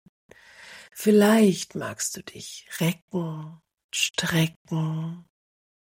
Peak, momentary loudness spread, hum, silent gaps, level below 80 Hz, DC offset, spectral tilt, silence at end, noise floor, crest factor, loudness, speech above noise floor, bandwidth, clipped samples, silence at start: -8 dBFS; 21 LU; none; 3.02-3.08 s, 3.84-3.89 s, 4.56-4.65 s; -66 dBFS; under 0.1%; -4.5 dB/octave; 0.75 s; -48 dBFS; 18 dB; -24 LUFS; 23 dB; 16.5 kHz; under 0.1%; 0.6 s